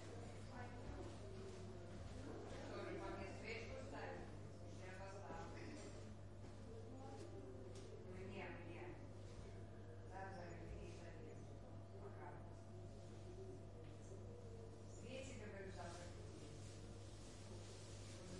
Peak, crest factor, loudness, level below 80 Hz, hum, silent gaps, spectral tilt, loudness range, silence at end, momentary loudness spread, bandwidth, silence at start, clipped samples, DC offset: -38 dBFS; 16 dB; -56 LUFS; -64 dBFS; none; none; -5.5 dB/octave; 4 LU; 0 s; 6 LU; 11 kHz; 0 s; under 0.1%; under 0.1%